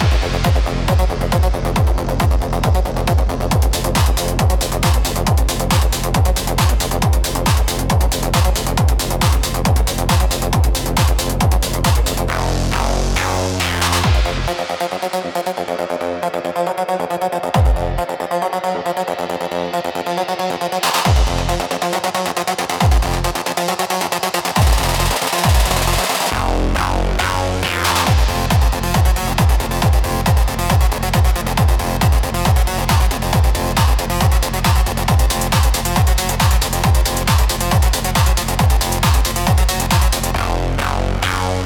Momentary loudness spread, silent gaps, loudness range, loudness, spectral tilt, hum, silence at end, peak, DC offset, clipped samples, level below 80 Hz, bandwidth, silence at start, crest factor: 5 LU; none; 4 LU; -17 LUFS; -4.5 dB/octave; none; 0 s; -2 dBFS; under 0.1%; under 0.1%; -20 dBFS; 18 kHz; 0 s; 14 dB